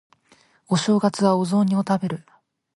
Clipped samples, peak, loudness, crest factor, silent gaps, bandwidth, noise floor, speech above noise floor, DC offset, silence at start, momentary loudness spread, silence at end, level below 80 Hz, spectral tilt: under 0.1%; -4 dBFS; -21 LUFS; 18 dB; none; 11.5 kHz; -58 dBFS; 38 dB; under 0.1%; 0.7 s; 7 LU; 0.55 s; -66 dBFS; -6 dB/octave